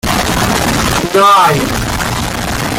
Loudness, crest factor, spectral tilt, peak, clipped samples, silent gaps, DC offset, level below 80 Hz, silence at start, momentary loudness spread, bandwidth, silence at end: -11 LUFS; 12 dB; -4 dB/octave; 0 dBFS; under 0.1%; none; under 0.1%; -26 dBFS; 0.05 s; 9 LU; 17 kHz; 0 s